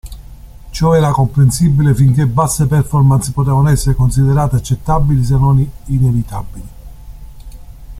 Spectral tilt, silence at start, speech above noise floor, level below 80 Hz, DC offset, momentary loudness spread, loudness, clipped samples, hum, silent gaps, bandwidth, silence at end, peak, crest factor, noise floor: -7 dB/octave; 0.05 s; 22 dB; -26 dBFS; under 0.1%; 7 LU; -13 LUFS; under 0.1%; none; none; 15 kHz; 0 s; -2 dBFS; 12 dB; -33 dBFS